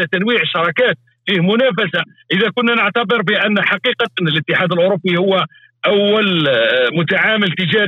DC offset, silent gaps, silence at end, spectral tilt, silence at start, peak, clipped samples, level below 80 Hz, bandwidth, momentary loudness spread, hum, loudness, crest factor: under 0.1%; none; 0 s; -7 dB/octave; 0 s; -6 dBFS; under 0.1%; -64 dBFS; 6.8 kHz; 5 LU; none; -15 LUFS; 10 dB